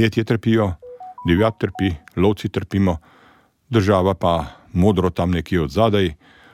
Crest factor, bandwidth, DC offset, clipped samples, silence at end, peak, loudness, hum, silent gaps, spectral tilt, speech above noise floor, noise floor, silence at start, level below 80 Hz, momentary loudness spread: 16 dB; 14.5 kHz; under 0.1%; under 0.1%; 0.4 s; -4 dBFS; -20 LUFS; none; none; -7.5 dB/octave; 35 dB; -54 dBFS; 0 s; -40 dBFS; 7 LU